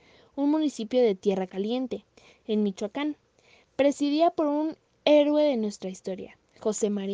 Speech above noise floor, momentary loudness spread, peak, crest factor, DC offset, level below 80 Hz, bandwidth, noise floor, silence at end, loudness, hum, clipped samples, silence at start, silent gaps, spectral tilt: 35 dB; 16 LU; -8 dBFS; 18 dB; under 0.1%; -72 dBFS; 9.8 kHz; -61 dBFS; 0 s; -26 LUFS; none; under 0.1%; 0.35 s; none; -5.5 dB/octave